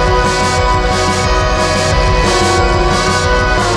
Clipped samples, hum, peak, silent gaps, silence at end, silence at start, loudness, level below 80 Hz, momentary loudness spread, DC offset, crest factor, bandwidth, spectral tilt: under 0.1%; none; 0 dBFS; none; 0 s; 0 s; -12 LUFS; -18 dBFS; 1 LU; under 0.1%; 12 dB; 13 kHz; -4 dB/octave